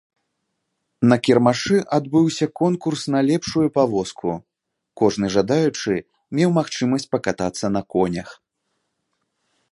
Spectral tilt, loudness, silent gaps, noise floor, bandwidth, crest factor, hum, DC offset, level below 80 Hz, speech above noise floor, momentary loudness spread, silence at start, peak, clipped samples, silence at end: -6 dB/octave; -20 LUFS; none; -75 dBFS; 11.5 kHz; 20 dB; none; under 0.1%; -54 dBFS; 56 dB; 8 LU; 1 s; 0 dBFS; under 0.1%; 1.4 s